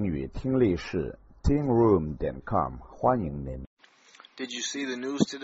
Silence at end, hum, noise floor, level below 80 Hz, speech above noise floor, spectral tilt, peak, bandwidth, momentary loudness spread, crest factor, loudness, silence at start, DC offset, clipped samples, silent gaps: 0 s; none; -55 dBFS; -42 dBFS; 28 dB; -6 dB/octave; -8 dBFS; 8 kHz; 14 LU; 20 dB; -28 LUFS; 0 s; under 0.1%; under 0.1%; 3.67-3.77 s